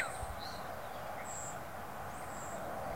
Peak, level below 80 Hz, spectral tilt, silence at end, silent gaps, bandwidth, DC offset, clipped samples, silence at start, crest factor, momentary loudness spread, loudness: -22 dBFS; -56 dBFS; -3.5 dB/octave; 0 s; none; 16 kHz; 0.3%; under 0.1%; 0 s; 20 dB; 3 LU; -43 LUFS